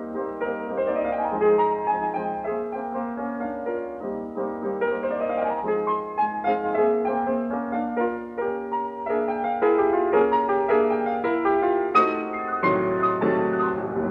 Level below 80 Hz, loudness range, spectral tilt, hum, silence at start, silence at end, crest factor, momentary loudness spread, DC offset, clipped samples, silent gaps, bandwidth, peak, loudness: -58 dBFS; 6 LU; -8.5 dB/octave; none; 0 s; 0 s; 16 dB; 9 LU; under 0.1%; under 0.1%; none; 5.4 kHz; -8 dBFS; -24 LUFS